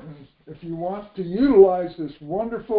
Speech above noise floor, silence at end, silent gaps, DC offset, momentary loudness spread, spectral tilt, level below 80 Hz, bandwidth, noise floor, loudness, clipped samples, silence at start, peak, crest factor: 22 dB; 0 s; none; under 0.1%; 19 LU; -12 dB/octave; -52 dBFS; 4.6 kHz; -43 dBFS; -21 LUFS; under 0.1%; 0.05 s; -2 dBFS; 20 dB